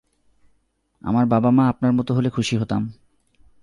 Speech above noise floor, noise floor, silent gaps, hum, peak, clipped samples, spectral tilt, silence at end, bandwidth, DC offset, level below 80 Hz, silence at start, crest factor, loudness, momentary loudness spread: 47 dB; -66 dBFS; none; none; -6 dBFS; under 0.1%; -7 dB/octave; 0.7 s; 11 kHz; under 0.1%; -52 dBFS; 1.05 s; 16 dB; -20 LUFS; 9 LU